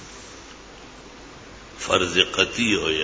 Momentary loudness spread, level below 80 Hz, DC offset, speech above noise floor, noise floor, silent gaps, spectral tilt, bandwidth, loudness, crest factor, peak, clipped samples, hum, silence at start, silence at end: 23 LU; -48 dBFS; under 0.1%; 22 dB; -43 dBFS; none; -2.5 dB/octave; 8 kHz; -20 LUFS; 24 dB; 0 dBFS; under 0.1%; none; 0 s; 0 s